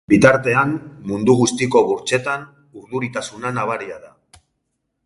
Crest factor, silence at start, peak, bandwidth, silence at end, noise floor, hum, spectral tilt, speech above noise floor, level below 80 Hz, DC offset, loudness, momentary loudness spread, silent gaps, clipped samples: 18 dB; 0.1 s; 0 dBFS; 11.5 kHz; 1 s; -73 dBFS; none; -5 dB/octave; 56 dB; -50 dBFS; under 0.1%; -18 LUFS; 14 LU; none; under 0.1%